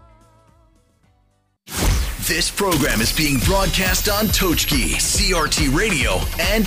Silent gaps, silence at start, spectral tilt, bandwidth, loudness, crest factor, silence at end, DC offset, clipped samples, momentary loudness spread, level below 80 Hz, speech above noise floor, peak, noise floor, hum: none; 1.7 s; -3 dB/octave; 15.5 kHz; -18 LUFS; 12 dB; 0 s; under 0.1%; under 0.1%; 4 LU; -26 dBFS; 44 dB; -8 dBFS; -62 dBFS; none